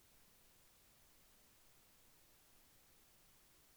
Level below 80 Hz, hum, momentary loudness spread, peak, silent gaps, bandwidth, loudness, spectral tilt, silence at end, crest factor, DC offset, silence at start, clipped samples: -80 dBFS; none; 0 LU; -56 dBFS; none; over 20 kHz; -68 LUFS; -2 dB/octave; 0 s; 14 dB; under 0.1%; 0 s; under 0.1%